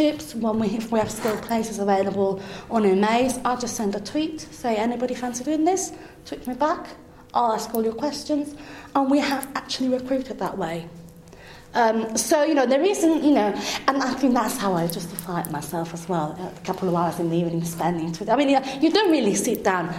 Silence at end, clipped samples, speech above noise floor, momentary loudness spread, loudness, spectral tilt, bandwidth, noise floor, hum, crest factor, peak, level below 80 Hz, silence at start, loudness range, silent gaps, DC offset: 0 s; under 0.1%; 21 dB; 10 LU; -23 LUFS; -4.5 dB/octave; 16 kHz; -44 dBFS; none; 20 dB; -4 dBFS; -54 dBFS; 0 s; 5 LU; none; under 0.1%